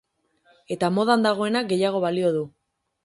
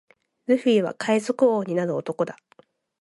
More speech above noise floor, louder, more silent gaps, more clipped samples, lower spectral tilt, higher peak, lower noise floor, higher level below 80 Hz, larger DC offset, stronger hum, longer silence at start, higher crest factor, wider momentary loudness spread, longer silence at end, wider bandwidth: first, 41 dB vs 36 dB; about the same, -23 LUFS vs -23 LUFS; neither; neither; about the same, -5.5 dB/octave vs -6 dB/octave; about the same, -6 dBFS vs -8 dBFS; first, -63 dBFS vs -58 dBFS; first, -68 dBFS vs -76 dBFS; neither; neither; first, 0.7 s vs 0.5 s; about the same, 18 dB vs 16 dB; about the same, 9 LU vs 9 LU; second, 0.55 s vs 0.7 s; about the same, 11.5 kHz vs 11.5 kHz